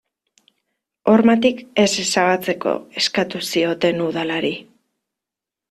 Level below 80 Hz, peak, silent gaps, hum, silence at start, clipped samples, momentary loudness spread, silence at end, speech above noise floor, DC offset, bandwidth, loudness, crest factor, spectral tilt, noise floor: -60 dBFS; -2 dBFS; none; none; 1.05 s; under 0.1%; 8 LU; 1.1 s; 68 dB; under 0.1%; 14 kHz; -18 LUFS; 18 dB; -4 dB/octave; -86 dBFS